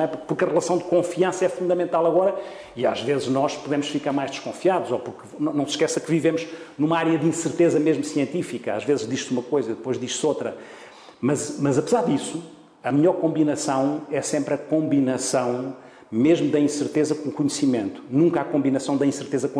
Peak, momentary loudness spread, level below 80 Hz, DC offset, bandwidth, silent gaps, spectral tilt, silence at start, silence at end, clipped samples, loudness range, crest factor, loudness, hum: -8 dBFS; 8 LU; -66 dBFS; under 0.1%; 11 kHz; none; -5.5 dB/octave; 0 s; 0 s; under 0.1%; 3 LU; 14 dB; -23 LUFS; none